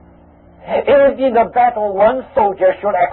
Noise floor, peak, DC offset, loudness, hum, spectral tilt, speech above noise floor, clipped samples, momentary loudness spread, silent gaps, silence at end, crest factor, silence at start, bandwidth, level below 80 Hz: -44 dBFS; -2 dBFS; under 0.1%; -14 LUFS; none; -10.5 dB/octave; 31 dB; under 0.1%; 5 LU; none; 0 s; 12 dB; 0.65 s; 4.2 kHz; -46 dBFS